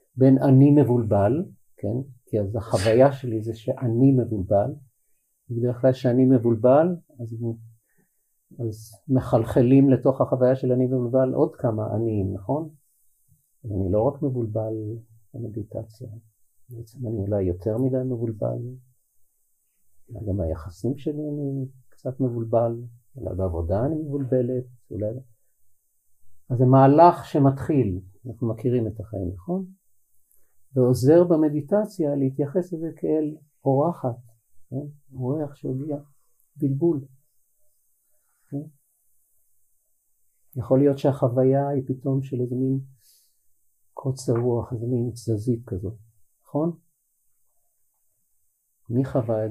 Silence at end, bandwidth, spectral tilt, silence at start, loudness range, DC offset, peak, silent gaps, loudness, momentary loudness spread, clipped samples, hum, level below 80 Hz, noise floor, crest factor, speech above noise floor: 0 s; 13 kHz; -9 dB/octave; 0.15 s; 10 LU; under 0.1%; -2 dBFS; none; -23 LUFS; 18 LU; under 0.1%; none; -52 dBFS; -69 dBFS; 22 dB; 47 dB